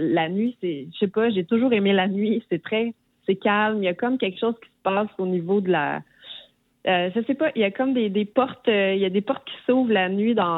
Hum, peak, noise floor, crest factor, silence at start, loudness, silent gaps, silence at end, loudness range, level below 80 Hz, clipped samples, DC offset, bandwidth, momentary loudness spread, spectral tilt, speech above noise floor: none; -6 dBFS; -48 dBFS; 16 dB; 0 s; -23 LUFS; none; 0 s; 3 LU; -74 dBFS; under 0.1%; under 0.1%; 4.1 kHz; 8 LU; -9 dB/octave; 26 dB